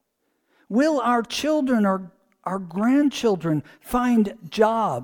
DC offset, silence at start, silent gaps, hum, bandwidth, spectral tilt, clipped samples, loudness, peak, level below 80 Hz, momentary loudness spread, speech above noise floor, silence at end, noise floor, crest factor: under 0.1%; 0.7 s; none; none; 19 kHz; -6 dB/octave; under 0.1%; -22 LUFS; -6 dBFS; -52 dBFS; 9 LU; 51 dB; 0 s; -73 dBFS; 16 dB